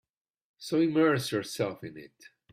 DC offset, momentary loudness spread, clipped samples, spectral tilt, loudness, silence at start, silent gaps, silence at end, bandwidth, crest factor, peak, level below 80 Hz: under 0.1%; 20 LU; under 0.1%; -5.5 dB/octave; -28 LUFS; 0.6 s; none; 0.45 s; 15.5 kHz; 18 dB; -14 dBFS; -72 dBFS